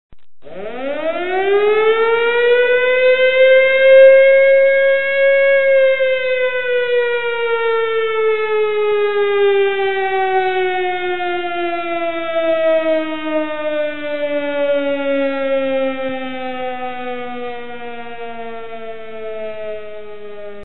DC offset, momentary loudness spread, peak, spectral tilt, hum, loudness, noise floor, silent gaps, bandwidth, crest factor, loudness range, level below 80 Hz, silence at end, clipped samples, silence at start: 3%; 19 LU; 0 dBFS; -8.5 dB/octave; none; -15 LUFS; -36 dBFS; none; 4.1 kHz; 16 dB; 15 LU; -58 dBFS; 0 s; under 0.1%; 0.1 s